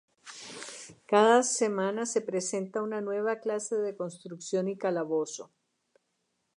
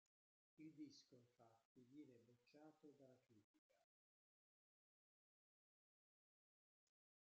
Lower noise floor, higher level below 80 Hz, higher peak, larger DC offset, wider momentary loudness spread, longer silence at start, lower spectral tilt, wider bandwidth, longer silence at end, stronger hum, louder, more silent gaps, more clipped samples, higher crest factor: second, -78 dBFS vs under -90 dBFS; about the same, -86 dBFS vs under -90 dBFS; first, -10 dBFS vs -50 dBFS; neither; first, 19 LU vs 7 LU; second, 0.25 s vs 0.55 s; second, -3.5 dB/octave vs -5.5 dB/octave; first, 11 kHz vs 7 kHz; second, 1.1 s vs 3.45 s; neither; first, -29 LUFS vs -66 LUFS; second, none vs 1.65-1.75 s, 3.44-3.70 s; neither; about the same, 22 dB vs 20 dB